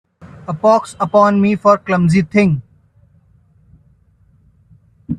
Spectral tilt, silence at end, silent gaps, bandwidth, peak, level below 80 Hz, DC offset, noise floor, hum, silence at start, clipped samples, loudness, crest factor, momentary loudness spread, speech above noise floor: -7.5 dB/octave; 0 s; none; 10.5 kHz; 0 dBFS; -50 dBFS; under 0.1%; -53 dBFS; none; 0.25 s; under 0.1%; -14 LUFS; 16 dB; 8 LU; 40 dB